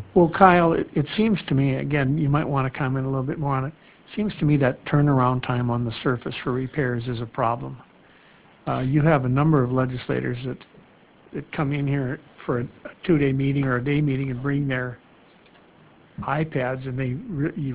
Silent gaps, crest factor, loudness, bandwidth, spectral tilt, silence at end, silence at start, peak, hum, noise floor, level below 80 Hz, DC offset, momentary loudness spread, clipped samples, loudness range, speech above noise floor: none; 22 dB; -23 LUFS; 4 kHz; -11.5 dB/octave; 0 s; 0 s; -2 dBFS; none; -53 dBFS; -48 dBFS; under 0.1%; 13 LU; under 0.1%; 4 LU; 31 dB